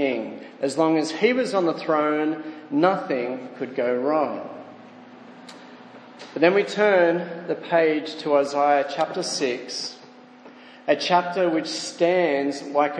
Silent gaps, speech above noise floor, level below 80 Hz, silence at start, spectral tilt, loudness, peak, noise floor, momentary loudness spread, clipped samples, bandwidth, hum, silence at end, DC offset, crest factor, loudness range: none; 24 dB; -82 dBFS; 0 s; -4.5 dB/octave; -23 LUFS; -2 dBFS; -47 dBFS; 15 LU; under 0.1%; 10 kHz; none; 0 s; under 0.1%; 20 dB; 5 LU